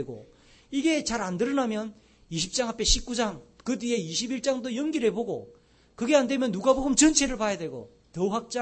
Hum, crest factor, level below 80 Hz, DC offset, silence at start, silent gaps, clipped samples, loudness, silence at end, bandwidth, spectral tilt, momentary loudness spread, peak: none; 24 dB; -42 dBFS; under 0.1%; 0 s; none; under 0.1%; -26 LUFS; 0 s; 8.8 kHz; -3 dB/octave; 14 LU; -4 dBFS